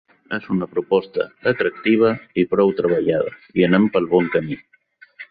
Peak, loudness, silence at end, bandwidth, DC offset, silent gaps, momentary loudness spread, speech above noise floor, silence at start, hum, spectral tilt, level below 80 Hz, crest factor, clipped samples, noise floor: -2 dBFS; -19 LUFS; 0.05 s; 5 kHz; under 0.1%; none; 11 LU; 28 dB; 0.3 s; none; -11 dB/octave; -56 dBFS; 16 dB; under 0.1%; -46 dBFS